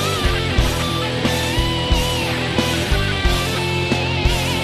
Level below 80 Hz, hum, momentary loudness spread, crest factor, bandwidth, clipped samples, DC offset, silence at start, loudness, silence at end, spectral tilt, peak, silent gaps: -24 dBFS; none; 1 LU; 16 dB; 13.5 kHz; under 0.1%; under 0.1%; 0 s; -19 LUFS; 0 s; -4.5 dB/octave; -4 dBFS; none